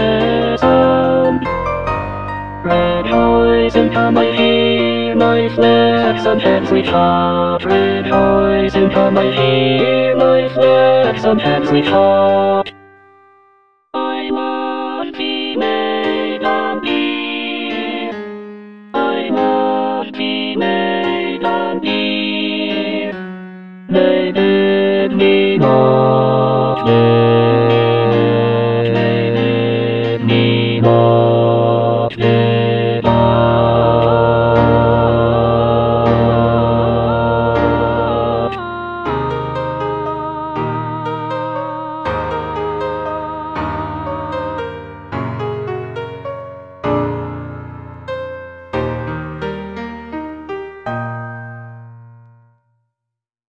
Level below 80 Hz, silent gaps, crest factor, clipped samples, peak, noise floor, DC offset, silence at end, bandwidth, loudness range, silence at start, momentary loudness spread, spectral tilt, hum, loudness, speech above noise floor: -38 dBFS; none; 14 dB; under 0.1%; 0 dBFS; -81 dBFS; 0.6%; 1.4 s; 6.4 kHz; 11 LU; 0 s; 14 LU; -8.5 dB/octave; none; -14 LUFS; 69 dB